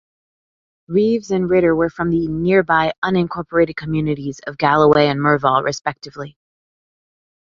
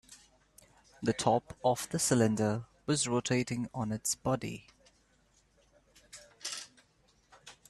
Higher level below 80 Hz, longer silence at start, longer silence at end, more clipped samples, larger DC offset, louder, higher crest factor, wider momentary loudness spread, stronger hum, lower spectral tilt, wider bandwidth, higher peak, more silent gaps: first, -48 dBFS vs -64 dBFS; first, 0.9 s vs 0.1 s; first, 1.3 s vs 0.2 s; neither; neither; first, -17 LUFS vs -32 LUFS; about the same, 18 dB vs 22 dB; second, 12 LU vs 20 LU; neither; first, -6.5 dB/octave vs -4.5 dB/octave; second, 7.6 kHz vs 13.5 kHz; first, -2 dBFS vs -12 dBFS; first, 2.98-3.02 s vs none